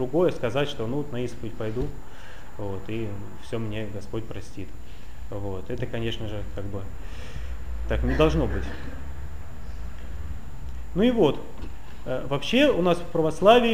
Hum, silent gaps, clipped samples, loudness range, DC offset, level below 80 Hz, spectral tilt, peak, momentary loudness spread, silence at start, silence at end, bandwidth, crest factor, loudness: none; none; under 0.1%; 10 LU; 3%; -38 dBFS; -6.5 dB/octave; -4 dBFS; 20 LU; 0 s; 0 s; 16 kHz; 24 dB; -27 LUFS